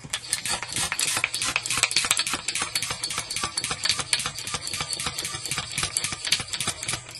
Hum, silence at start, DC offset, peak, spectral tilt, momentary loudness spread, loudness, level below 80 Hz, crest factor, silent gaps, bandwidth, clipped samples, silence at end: none; 0 s; under 0.1%; 0 dBFS; 0 dB/octave; 6 LU; -25 LUFS; -52 dBFS; 28 dB; none; 13 kHz; under 0.1%; 0 s